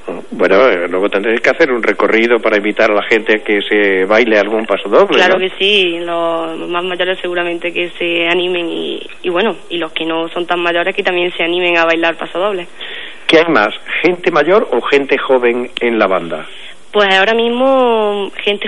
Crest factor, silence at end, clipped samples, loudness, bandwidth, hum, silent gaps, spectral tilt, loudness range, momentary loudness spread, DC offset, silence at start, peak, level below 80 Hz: 14 dB; 0 s; under 0.1%; -13 LUFS; 11 kHz; none; none; -4.5 dB/octave; 5 LU; 9 LU; 3%; 0.05 s; 0 dBFS; -56 dBFS